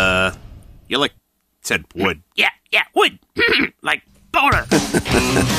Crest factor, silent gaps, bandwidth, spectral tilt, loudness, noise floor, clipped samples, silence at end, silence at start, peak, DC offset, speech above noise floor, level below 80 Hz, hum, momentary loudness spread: 18 dB; none; 15.5 kHz; -3.5 dB/octave; -18 LUFS; -40 dBFS; under 0.1%; 0 s; 0 s; -2 dBFS; under 0.1%; 22 dB; -38 dBFS; none; 7 LU